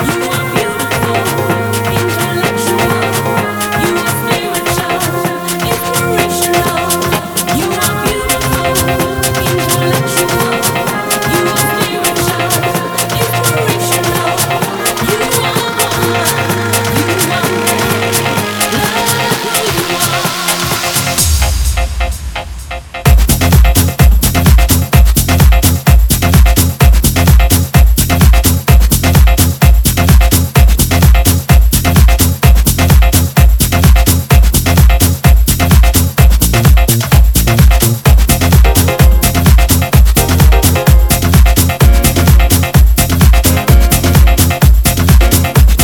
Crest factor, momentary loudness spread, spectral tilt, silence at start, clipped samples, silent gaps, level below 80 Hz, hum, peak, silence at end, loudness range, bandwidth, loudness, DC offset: 8 dB; 5 LU; -4.5 dB/octave; 0 s; 0.2%; none; -12 dBFS; none; 0 dBFS; 0 s; 4 LU; over 20 kHz; -10 LUFS; under 0.1%